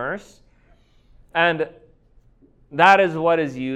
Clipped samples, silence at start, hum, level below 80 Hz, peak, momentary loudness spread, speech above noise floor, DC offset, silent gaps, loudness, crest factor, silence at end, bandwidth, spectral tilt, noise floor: under 0.1%; 0 s; none; -56 dBFS; 0 dBFS; 17 LU; 37 dB; under 0.1%; none; -18 LUFS; 22 dB; 0 s; 10 kHz; -5.5 dB/octave; -55 dBFS